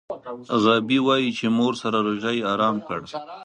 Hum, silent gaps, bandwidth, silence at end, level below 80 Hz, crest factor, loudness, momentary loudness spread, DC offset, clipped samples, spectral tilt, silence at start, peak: none; none; 10 kHz; 0 s; -64 dBFS; 18 dB; -22 LUFS; 12 LU; under 0.1%; under 0.1%; -5.5 dB/octave; 0.1 s; -4 dBFS